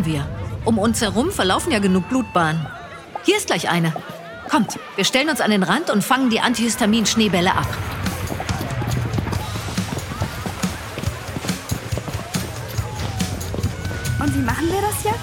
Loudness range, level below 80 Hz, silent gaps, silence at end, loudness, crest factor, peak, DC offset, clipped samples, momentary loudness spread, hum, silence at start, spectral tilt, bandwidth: 8 LU; -38 dBFS; none; 0 s; -21 LUFS; 18 dB; -2 dBFS; under 0.1%; under 0.1%; 10 LU; none; 0 s; -4.5 dB/octave; 17.5 kHz